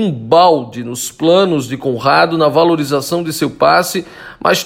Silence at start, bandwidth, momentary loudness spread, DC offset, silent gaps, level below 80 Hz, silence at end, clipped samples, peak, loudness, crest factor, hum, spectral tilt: 0 s; 16.5 kHz; 11 LU; under 0.1%; none; -52 dBFS; 0 s; under 0.1%; 0 dBFS; -13 LUFS; 14 dB; none; -4.5 dB/octave